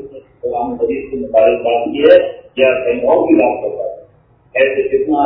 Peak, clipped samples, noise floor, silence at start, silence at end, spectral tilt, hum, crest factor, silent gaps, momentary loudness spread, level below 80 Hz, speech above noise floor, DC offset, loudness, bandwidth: 0 dBFS; 0.1%; -49 dBFS; 0 s; 0 s; -8.5 dB/octave; none; 14 dB; none; 12 LU; -48 dBFS; 37 dB; under 0.1%; -14 LUFS; 5 kHz